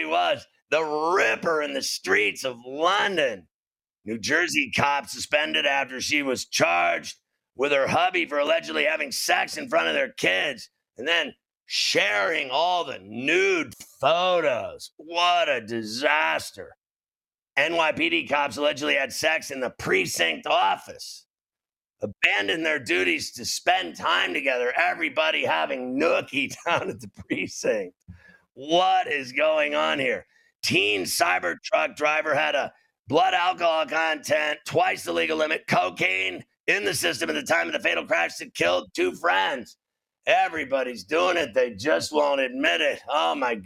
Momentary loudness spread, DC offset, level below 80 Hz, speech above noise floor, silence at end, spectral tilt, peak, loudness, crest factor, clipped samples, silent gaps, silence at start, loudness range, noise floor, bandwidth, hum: 8 LU; under 0.1%; -68 dBFS; over 66 dB; 0 s; -2.5 dB/octave; -2 dBFS; -23 LUFS; 24 dB; under 0.1%; 0.62-0.66 s, 3.51-3.71 s, 14.93-14.97 s, 16.96-17.00 s, 21.30-21.34 s, 30.55-30.59 s, 32.99-33.04 s, 36.60-36.64 s; 0 s; 2 LU; under -90 dBFS; 16.5 kHz; none